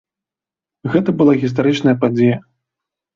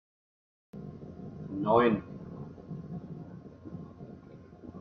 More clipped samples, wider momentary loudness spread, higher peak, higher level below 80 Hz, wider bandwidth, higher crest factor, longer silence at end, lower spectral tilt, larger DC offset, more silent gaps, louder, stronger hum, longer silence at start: neither; second, 7 LU vs 24 LU; first, -2 dBFS vs -12 dBFS; first, -56 dBFS vs -62 dBFS; first, 7.4 kHz vs 6.2 kHz; second, 16 dB vs 24 dB; first, 0.75 s vs 0 s; second, -8 dB/octave vs -9.5 dB/octave; neither; neither; first, -15 LUFS vs -31 LUFS; neither; about the same, 0.85 s vs 0.75 s